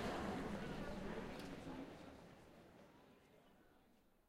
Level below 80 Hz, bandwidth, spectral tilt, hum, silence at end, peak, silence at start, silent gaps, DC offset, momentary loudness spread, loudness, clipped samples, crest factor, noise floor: -62 dBFS; 16 kHz; -6 dB/octave; none; 0.2 s; -32 dBFS; 0 s; none; under 0.1%; 22 LU; -49 LUFS; under 0.1%; 18 dB; -73 dBFS